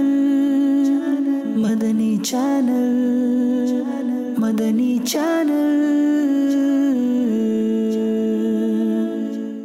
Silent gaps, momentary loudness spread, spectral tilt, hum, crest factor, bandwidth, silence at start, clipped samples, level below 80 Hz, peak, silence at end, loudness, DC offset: none; 4 LU; -5.5 dB/octave; none; 8 dB; 15.5 kHz; 0 s; under 0.1%; -66 dBFS; -10 dBFS; 0 s; -19 LUFS; under 0.1%